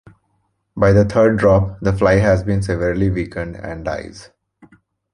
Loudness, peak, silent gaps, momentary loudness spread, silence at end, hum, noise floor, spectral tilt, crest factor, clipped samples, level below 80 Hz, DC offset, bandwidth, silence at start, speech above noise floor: -17 LUFS; -2 dBFS; none; 14 LU; 0.9 s; none; -67 dBFS; -8 dB/octave; 16 dB; under 0.1%; -34 dBFS; under 0.1%; 10.5 kHz; 0.75 s; 51 dB